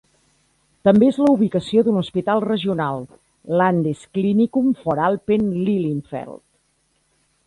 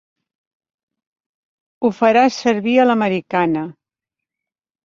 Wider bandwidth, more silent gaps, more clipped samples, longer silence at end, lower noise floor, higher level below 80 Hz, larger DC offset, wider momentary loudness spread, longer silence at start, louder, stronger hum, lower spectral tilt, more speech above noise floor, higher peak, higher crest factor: first, 11 kHz vs 7.4 kHz; neither; neither; about the same, 1.1 s vs 1.15 s; second, -65 dBFS vs -86 dBFS; first, -56 dBFS vs -64 dBFS; neither; about the same, 10 LU vs 8 LU; second, 0.85 s vs 1.8 s; second, -19 LUFS vs -16 LUFS; neither; first, -8 dB/octave vs -5.5 dB/octave; second, 47 dB vs 71 dB; about the same, -2 dBFS vs -2 dBFS; about the same, 18 dB vs 18 dB